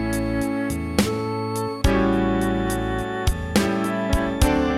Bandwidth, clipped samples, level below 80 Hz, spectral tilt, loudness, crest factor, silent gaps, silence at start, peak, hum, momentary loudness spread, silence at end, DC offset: 16.5 kHz; under 0.1%; -30 dBFS; -5.5 dB/octave; -23 LUFS; 18 dB; none; 0 s; -4 dBFS; none; 5 LU; 0 s; under 0.1%